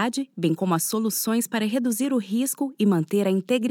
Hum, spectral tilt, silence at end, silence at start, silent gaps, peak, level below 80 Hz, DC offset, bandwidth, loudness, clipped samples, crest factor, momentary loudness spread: none; -5 dB/octave; 0 s; 0 s; none; -10 dBFS; -82 dBFS; under 0.1%; 19 kHz; -24 LUFS; under 0.1%; 14 dB; 3 LU